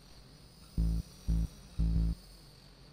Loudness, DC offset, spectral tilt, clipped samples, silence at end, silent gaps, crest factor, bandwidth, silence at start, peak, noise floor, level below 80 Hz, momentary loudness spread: -36 LUFS; under 0.1%; -7.5 dB/octave; under 0.1%; 0.55 s; none; 14 dB; 10 kHz; 0.15 s; -20 dBFS; -56 dBFS; -36 dBFS; 22 LU